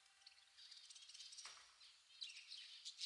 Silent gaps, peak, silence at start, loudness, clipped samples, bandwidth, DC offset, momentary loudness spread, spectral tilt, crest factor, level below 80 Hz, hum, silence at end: none; -36 dBFS; 0 s; -57 LUFS; under 0.1%; 12 kHz; under 0.1%; 11 LU; 4.5 dB/octave; 24 dB; under -90 dBFS; none; 0 s